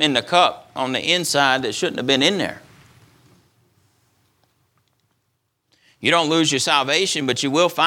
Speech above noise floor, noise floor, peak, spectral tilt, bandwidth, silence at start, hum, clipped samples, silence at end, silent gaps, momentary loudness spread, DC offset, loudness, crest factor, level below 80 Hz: 53 dB; -71 dBFS; 0 dBFS; -3 dB/octave; 18.5 kHz; 0 s; none; under 0.1%; 0 s; none; 7 LU; under 0.1%; -18 LUFS; 20 dB; -66 dBFS